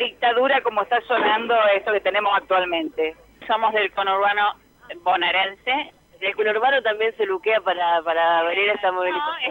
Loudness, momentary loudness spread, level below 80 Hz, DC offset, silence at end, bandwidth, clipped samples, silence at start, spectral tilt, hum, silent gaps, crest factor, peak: -21 LUFS; 7 LU; -62 dBFS; under 0.1%; 0 s; 16.5 kHz; under 0.1%; 0 s; -4.5 dB/octave; none; none; 14 dB; -8 dBFS